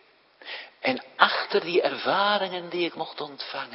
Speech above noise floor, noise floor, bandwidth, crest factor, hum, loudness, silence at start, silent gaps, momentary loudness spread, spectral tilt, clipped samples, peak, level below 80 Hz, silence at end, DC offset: 22 dB; -48 dBFS; 5.8 kHz; 28 dB; none; -25 LUFS; 0.4 s; none; 15 LU; -6.5 dB/octave; under 0.1%; 0 dBFS; -80 dBFS; 0 s; under 0.1%